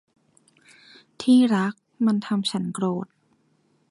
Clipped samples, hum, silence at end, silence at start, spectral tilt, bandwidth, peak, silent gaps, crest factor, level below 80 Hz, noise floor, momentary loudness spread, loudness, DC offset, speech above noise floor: under 0.1%; none; 0.85 s; 1.2 s; -6 dB/octave; 11.5 kHz; -8 dBFS; none; 16 dB; -72 dBFS; -65 dBFS; 12 LU; -23 LUFS; under 0.1%; 44 dB